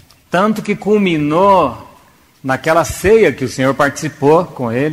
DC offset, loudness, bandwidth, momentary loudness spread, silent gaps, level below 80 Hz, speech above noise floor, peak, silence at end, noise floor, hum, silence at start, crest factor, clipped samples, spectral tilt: under 0.1%; -14 LUFS; 16 kHz; 9 LU; none; -40 dBFS; 34 dB; 0 dBFS; 0 s; -47 dBFS; none; 0.3 s; 14 dB; under 0.1%; -5.5 dB/octave